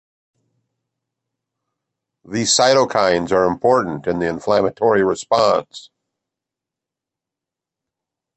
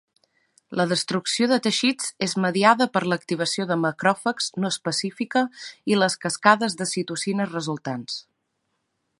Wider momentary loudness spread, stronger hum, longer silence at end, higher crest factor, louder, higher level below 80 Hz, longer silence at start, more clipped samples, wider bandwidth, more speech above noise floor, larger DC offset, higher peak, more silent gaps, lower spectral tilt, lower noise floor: about the same, 8 LU vs 10 LU; neither; first, 2.55 s vs 1 s; second, 18 dB vs 24 dB; first, -17 LUFS vs -23 LUFS; first, -54 dBFS vs -72 dBFS; first, 2.3 s vs 0.7 s; neither; second, 8.8 kHz vs 11.5 kHz; first, 69 dB vs 52 dB; neither; about the same, -2 dBFS vs 0 dBFS; neither; about the same, -3.5 dB/octave vs -4 dB/octave; first, -86 dBFS vs -75 dBFS